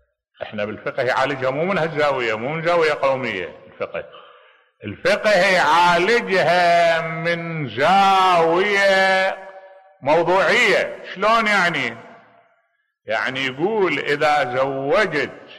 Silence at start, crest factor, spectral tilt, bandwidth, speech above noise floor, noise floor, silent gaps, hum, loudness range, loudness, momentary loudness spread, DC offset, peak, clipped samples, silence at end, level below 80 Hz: 0.4 s; 12 dB; -4.5 dB/octave; 13.5 kHz; 49 dB; -68 dBFS; none; none; 5 LU; -18 LUFS; 13 LU; under 0.1%; -8 dBFS; under 0.1%; 0 s; -58 dBFS